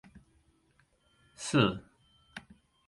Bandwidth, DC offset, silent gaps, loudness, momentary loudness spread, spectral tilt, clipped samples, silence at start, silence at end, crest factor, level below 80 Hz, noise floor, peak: 11.5 kHz; under 0.1%; none; -30 LUFS; 22 LU; -5 dB/octave; under 0.1%; 0.15 s; 0.5 s; 24 dB; -64 dBFS; -70 dBFS; -12 dBFS